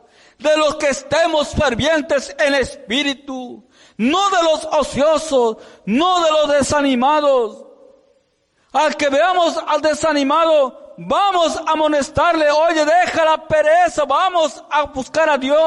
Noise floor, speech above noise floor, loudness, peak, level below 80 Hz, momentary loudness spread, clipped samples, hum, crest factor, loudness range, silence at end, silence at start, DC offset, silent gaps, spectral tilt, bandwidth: -62 dBFS; 46 dB; -16 LUFS; -6 dBFS; -44 dBFS; 7 LU; under 0.1%; none; 10 dB; 3 LU; 0 s; 0.4 s; under 0.1%; none; -3.5 dB/octave; 11.5 kHz